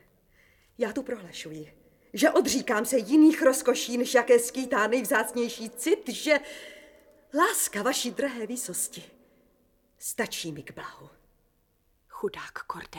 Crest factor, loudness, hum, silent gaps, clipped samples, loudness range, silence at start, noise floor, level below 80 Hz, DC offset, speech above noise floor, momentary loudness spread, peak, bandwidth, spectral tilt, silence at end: 18 dB; -26 LUFS; none; none; under 0.1%; 13 LU; 0.8 s; -69 dBFS; -66 dBFS; under 0.1%; 42 dB; 18 LU; -8 dBFS; 19 kHz; -2.5 dB/octave; 0 s